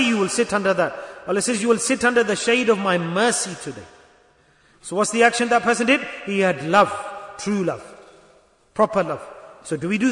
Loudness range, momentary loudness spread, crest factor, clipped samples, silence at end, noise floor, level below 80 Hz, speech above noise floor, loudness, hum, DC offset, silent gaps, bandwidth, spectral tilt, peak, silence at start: 3 LU; 16 LU; 18 dB; under 0.1%; 0 s; -57 dBFS; -60 dBFS; 37 dB; -20 LUFS; none; under 0.1%; none; 11 kHz; -3.5 dB/octave; -4 dBFS; 0 s